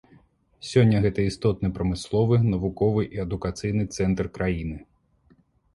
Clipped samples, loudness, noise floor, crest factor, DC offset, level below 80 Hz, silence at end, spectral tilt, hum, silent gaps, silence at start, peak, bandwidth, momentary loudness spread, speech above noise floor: under 0.1%; -24 LUFS; -61 dBFS; 20 dB; under 0.1%; -42 dBFS; 0.95 s; -7.5 dB/octave; none; none; 0.65 s; -6 dBFS; 11.5 kHz; 9 LU; 38 dB